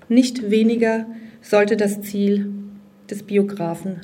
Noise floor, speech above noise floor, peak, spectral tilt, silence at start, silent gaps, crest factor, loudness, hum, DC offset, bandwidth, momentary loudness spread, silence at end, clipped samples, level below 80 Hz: -39 dBFS; 20 dB; -2 dBFS; -6 dB/octave; 0.1 s; none; 18 dB; -20 LUFS; none; under 0.1%; 16.5 kHz; 17 LU; 0 s; under 0.1%; -68 dBFS